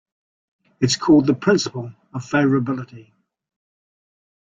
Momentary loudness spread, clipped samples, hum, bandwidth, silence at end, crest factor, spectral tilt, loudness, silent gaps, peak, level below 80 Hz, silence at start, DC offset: 18 LU; under 0.1%; none; 9.2 kHz; 1.4 s; 18 dB; -5.5 dB/octave; -19 LUFS; none; -4 dBFS; -60 dBFS; 0.8 s; under 0.1%